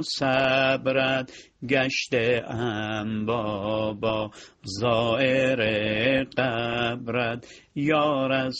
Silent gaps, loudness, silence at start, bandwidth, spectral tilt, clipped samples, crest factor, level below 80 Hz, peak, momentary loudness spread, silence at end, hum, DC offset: none; -24 LUFS; 0 s; 9 kHz; -5.5 dB/octave; under 0.1%; 18 dB; -56 dBFS; -8 dBFS; 8 LU; 0 s; none; under 0.1%